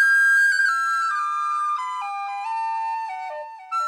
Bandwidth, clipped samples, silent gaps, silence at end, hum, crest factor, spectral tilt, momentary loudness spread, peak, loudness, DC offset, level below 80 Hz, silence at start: 14.5 kHz; under 0.1%; none; 0 s; none; 12 dB; 4.5 dB/octave; 15 LU; -10 dBFS; -21 LUFS; under 0.1%; under -90 dBFS; 0 s